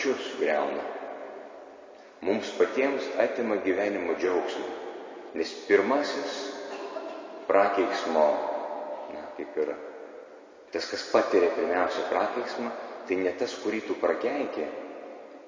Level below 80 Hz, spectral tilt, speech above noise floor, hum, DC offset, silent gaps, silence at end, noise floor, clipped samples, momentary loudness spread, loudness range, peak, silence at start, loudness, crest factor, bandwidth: -70 dBFS; -4 dB/octave; 22 dB; none; under 0.1%; none; 0 s; -49 dBFS; under 0.1%; 17 LU; 3 LU; -8 dBFS; 0 s; -28 LUFS; 20 dB; 7.6 kHz